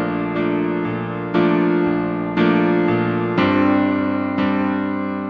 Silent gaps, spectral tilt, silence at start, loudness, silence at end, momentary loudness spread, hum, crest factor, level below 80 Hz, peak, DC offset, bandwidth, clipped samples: none; -6 dB/octave; 0 s; -19 LUFS; 0 s; 6 LU; none; 14 dB; -52 dBFS; -4 dBFS; under 0.1%; 5.8 kHz; under 0.1%